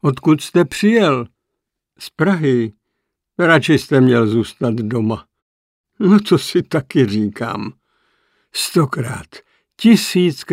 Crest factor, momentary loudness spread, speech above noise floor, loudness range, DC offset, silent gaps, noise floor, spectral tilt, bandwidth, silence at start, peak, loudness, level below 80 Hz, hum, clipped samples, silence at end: 16 dB; 14 LU; 63 dB; 3 LU; under 0.1%; 5.42-5.84 s; -78 dBFS; -6 dB/octave; 16 kHz; 0.05 s; 0 dBFS; -16 LUFS; -56 dBFS; none; under 0.1%; 0 s